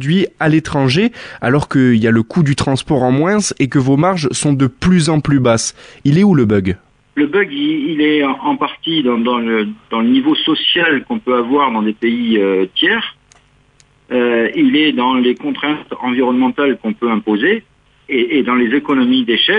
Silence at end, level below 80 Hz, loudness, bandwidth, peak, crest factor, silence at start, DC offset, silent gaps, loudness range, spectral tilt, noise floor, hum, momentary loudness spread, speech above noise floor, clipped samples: 0 s; -46 dBFS; -14 LUFS; 10.5 kHz; 0 dBFS; 14 dB; 0 s; under 0.1%; none; 2 LU; -5.5 dB/octave; -51 dBFS; none; 6 LU; 38 dB; under 0.1%